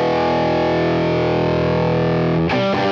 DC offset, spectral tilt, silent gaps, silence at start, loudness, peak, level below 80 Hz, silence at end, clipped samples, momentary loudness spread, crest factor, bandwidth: under 0.1%; -7.5 dB/octave; none; 0 s; -17 LUFS; -8 dBFS; -44 dBFS; 0 s; under 0.1%; 0 LU; 10 dB; 7 kHz